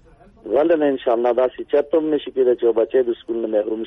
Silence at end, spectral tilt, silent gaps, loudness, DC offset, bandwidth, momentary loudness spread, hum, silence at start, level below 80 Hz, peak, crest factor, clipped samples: 0 s; -7.5 dB/octave; none; -19 LUFS; under 0.1%; 3.9 kHz; 5 LU; none; 0.45 s; -56 dBFS; -6 dBFS; 12 dB; under 0.1%